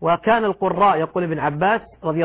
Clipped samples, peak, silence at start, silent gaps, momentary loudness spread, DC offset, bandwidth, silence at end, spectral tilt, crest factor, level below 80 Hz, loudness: under 0.1%; -6 dBFS; 0 s; none; 6 LU; under 0.1%; 4 kHz; 0 s; -10 dB/octave; 14 dB; -52 dBFS; -19 LUFS